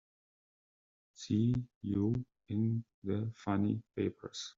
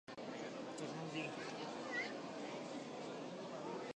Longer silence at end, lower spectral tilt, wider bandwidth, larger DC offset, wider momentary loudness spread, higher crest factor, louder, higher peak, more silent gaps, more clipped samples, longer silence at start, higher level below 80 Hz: about the same, 0.05 s vs 0.05 s; first, -8 dB/octave vs -4.5 dB/octave; second, 7.6 kHz vs 10 kHz; neither; about the same, 7 LU vs 5 LU; about the same, 18 dB vs 16 dB; first, -36 LUFS vs -46 LUFS; first, -20 dBFS vs -30 dBFS; first, 1.75-1.81 s, 2.94-3.02 s vs none; neither; first, 1.2 s vs 0.1 s; first, -66 dBFS vs -86 dBFS